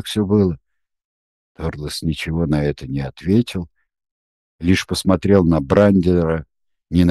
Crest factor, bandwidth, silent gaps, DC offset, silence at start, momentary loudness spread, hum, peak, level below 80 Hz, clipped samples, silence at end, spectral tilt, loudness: 18 dB; 12.5 kHz; 1.05-1.55 s, 4.11-4.59 s; under 0.1%; 0.05 s; 13 LU; none; 0 dBFS; -38 dBFS; under 0.1%; 0 s; -7 dB/octave; -18 LUFS